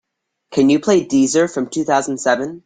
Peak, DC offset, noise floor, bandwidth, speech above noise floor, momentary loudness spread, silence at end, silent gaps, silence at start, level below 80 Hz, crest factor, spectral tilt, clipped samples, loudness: -2 dBFS; under 0.1%; -73 dBFS; 9.4 kHz; 58 dB; 5 LU; 0.1 s; none; 0.5 s; -58 dBFS; 16 dB; -4.5 dB/octave; under 0.1%; -16 LUFS